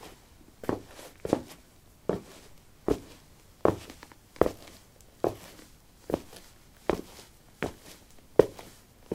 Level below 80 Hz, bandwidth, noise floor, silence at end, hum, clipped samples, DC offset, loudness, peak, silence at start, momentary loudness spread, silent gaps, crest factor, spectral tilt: -54 dBFS; 17.5 kHz; -56 dBFS; 0 s; none; under 0.1%; under 0.1%; -32 LUFS; -2 dBFS; 0 s; 23 LU; none; 32 dB; -6 dB/octave